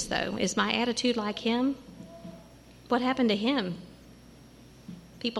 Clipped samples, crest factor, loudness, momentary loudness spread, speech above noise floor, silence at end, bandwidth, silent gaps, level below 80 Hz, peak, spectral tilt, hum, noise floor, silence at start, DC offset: under 0.1%; 18 dB; -28 LUFS; 21 LU; 24 dB; 0 s; 12.5 kHz; none; -58 dBFS; -12 dBFS; -4 dB/octave; none; -52 dBFS; 0 s; under 0.1%